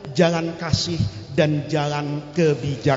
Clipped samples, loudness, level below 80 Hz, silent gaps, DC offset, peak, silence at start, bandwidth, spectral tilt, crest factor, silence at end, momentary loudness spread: under 0.1%; -22 LUFS; -46 dBFS; none; under 0.1%; -4 dBFS; 0 s; 7.8 kHz; -6 dB/octave; 18 dB; 0 s; 6 LU